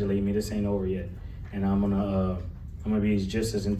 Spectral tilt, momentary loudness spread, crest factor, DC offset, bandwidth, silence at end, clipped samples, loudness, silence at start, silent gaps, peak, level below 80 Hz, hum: -7 dB/octave; 12 LU; 12 dB; under 0.1%; 14 kHz; 0 s; under 0.1%; -28 LUFS; 0 s; none; -14 dBFS; -40 dBFS; none